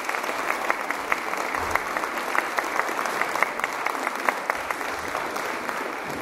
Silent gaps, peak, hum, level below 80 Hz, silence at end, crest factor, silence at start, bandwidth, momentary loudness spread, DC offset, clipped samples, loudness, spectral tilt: none; -2 dBFS; none; -58 dBFS; 0 s; 24 dB; 0 s; 16 kHz; 4 LU; under 0.1%; under 0.1%; -26 LUFS; -2 dB/octave